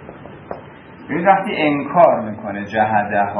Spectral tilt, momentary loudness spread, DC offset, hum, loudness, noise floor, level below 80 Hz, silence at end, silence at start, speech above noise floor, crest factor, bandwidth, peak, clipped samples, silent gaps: -8 dB/octave; 20 LU; under 0.1%; none; -17 LUFS; -38 dBFS; -56 dBFS; 0 s; 0 s; 22 dB; 18 dB; 10.5 kHz; 0 dBFS; under 0.1%; none